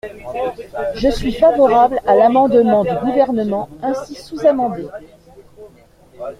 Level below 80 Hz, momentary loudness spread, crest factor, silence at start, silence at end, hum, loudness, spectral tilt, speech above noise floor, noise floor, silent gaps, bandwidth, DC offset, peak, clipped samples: -40 dBFS; 16 LU; 16 dB; 0.05 s; 0.05 s; none; -15 LUFS; -6.5 dB/octave; 32 dB; -47 dBFS; none; 13.5 kHz; under 0.1%; 0 dBFS; under 0.1%